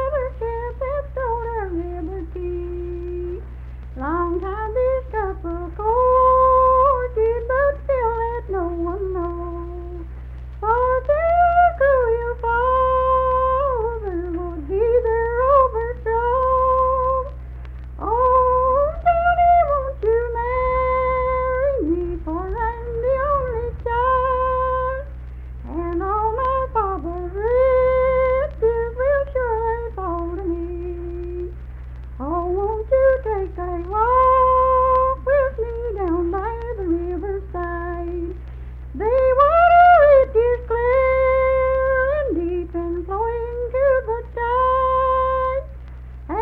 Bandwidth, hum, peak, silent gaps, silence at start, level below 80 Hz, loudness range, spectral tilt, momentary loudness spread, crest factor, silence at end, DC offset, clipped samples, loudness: 4.4 kHz; none; -4 dBFS; none; 0 s; -32 dBFS; 9 LU; -10 dB/octave; 14 LU; 16 dB; 0 s; under 0.1%; under 0.1%; -20 LUFS